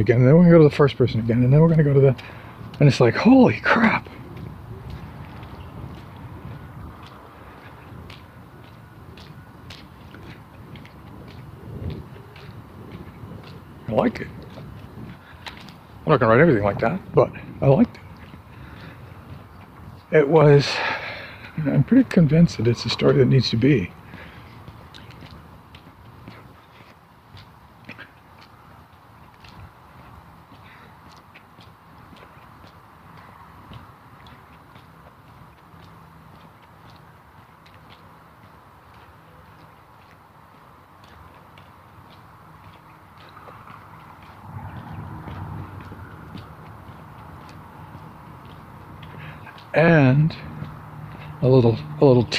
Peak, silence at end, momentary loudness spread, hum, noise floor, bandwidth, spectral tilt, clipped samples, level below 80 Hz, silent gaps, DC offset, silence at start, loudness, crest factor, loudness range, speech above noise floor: -2 dBFS; 0 s; 27 LU; none; -49 dBFS; 8.8 kHz; -8 dB/octave; under 0.1%; -50 dBFS; none; under 0.1%; 0 s; -18 LUFS; 22 dB; 24 LU; 33 dB